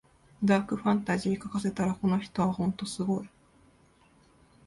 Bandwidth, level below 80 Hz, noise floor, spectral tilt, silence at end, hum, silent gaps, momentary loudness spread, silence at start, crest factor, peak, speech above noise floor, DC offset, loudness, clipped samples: 11.5 kHz; -60 dBFS; -62 dBFS; -6.5 dB/octave; 1.4 s; none; none; 6 LU; 0.4 s; 18 dB; -12 dBFS; 33 dB; under 0.1%; -29 LUFS; under 0.1%